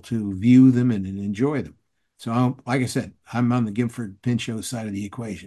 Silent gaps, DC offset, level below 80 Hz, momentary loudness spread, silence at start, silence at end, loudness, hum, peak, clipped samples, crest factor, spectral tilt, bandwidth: none; under 0.1%; -52 dBFS; 15 LU; 0.05 s; 0 s; -22 LUFS; none; -6 dBFS; under 0.1%; 16 dB; -7 dB/octave; 12.5 kHz